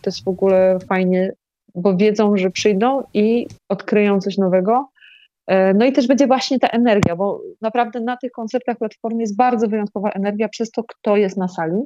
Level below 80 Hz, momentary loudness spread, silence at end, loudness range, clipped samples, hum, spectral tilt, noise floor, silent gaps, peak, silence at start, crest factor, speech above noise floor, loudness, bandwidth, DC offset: -56 dBFS; 10 LU; 0 s; 4 LU; under 0.1%; none; -6.5 dB/octave; -49 dBFS; none; -2 dBFS; 0.05 s; 16 dB; 32 dB; -18 LUFS; 8 kHz; under 0.1%